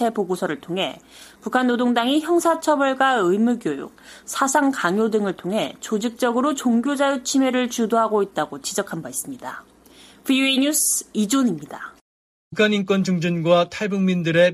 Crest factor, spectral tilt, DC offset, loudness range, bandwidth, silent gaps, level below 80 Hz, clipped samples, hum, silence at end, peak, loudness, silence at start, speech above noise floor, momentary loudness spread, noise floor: 16 dB; -4 dB/octave; under 0.1%; 2 LU; 15.5 kHz; 12.01-12.51 s; -64 dBFS; under 0.1%; none; 0 s; -4 dBFS; -21 LUFS; 0 s; 28 dB; 13 LU; -49 dBFS